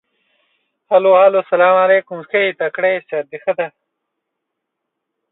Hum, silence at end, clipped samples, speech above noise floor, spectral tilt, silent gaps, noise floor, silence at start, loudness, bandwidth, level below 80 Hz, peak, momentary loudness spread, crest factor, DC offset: none; 1.65 s; under 0.1%; 63 dB; -8.5 dB/octave; none; -77 dBFS; 0.9 s; -15 LUFS; 4.1 kHz; -72 dBFS; 0 dBFS; 11 LU; 16 dB; under 0.1%